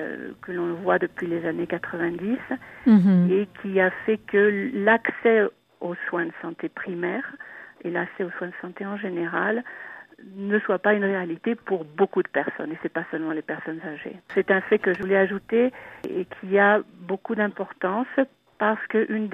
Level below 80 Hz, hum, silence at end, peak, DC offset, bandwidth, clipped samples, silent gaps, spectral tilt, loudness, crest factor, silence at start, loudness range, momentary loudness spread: -68 dBFS; none; 0 s; -4 dBFS; under 0.1%; 5 kHz; under 0.1%; none; -9 dB/octave; -24 LUFS; 20 dB; 0 s; 8 LU; 13 LU